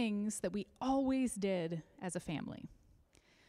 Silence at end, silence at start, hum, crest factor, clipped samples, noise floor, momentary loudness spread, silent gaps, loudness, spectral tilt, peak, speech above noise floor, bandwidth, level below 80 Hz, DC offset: 0.75 s; 0 s; none; 14 dB; under 0.1%; -68 dBFS; 11 LU; none; -38 LUFS; -5.5 dB/octave; -24 dBFS; 30 dB; 13.5 kHz; -66 dBFS; under 0.1%